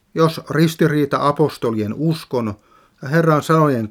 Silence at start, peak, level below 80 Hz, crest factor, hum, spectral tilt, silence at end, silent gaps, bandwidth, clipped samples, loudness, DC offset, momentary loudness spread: 0.15 s; -2 dBFS; -58 dBFS; 16 dB; none; -7 dB/octave; 0 s; none; 16 kHz; under 0.1%; -18 LUFS; under 0.1%; 8 LU